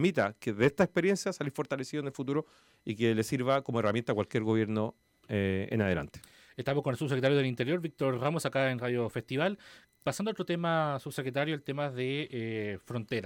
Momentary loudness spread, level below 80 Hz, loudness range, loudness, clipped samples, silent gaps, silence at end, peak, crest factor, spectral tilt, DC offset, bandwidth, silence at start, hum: 8 LU; -66 dBFS; 2 LU; -32 LUFS; under 0.1%; none; 0 s; -14 dBFS; 16 dB; -6 dB/octave; under 0.1%; 17 kHz; 0 s; none